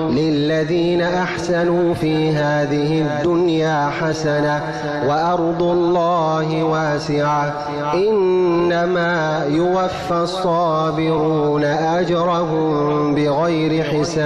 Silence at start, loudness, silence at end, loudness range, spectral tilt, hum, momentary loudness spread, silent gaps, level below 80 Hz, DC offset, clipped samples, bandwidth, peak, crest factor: 0 s; -18 LUFS; 0 s; 1 LU; -6.5 dB/octave; none; 3 LU; none; -46 dBFS; under 0.1%; under 0.1%; 10.5 kHz; -10 dBFS; 8 dB